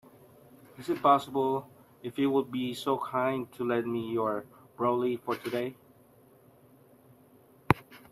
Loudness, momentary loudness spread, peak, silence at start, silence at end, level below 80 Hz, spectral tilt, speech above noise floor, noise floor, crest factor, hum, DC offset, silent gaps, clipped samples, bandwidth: -30 LUFS; 10 LU; -4 dBFS; 0.8 s; 0.15 s; -62 dBFS; -6.5 dB/octave; 30 dB; -59 dBFS; 28 dB; none; under 0.1%; none; under 0.1%; 14.5 kHz